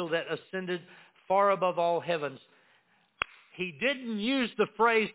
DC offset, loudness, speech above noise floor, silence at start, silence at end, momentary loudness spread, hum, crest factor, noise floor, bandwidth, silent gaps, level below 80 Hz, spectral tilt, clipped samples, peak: under 0.1%; -30 LUFS; 38 dB; 0 s; 0.05 s; 12 LU; none; 22 dB; -67 dBFS; 4 kHz; none; -72 dBFS; -2.5 dB/octave; under 0.1%; -8 dBFS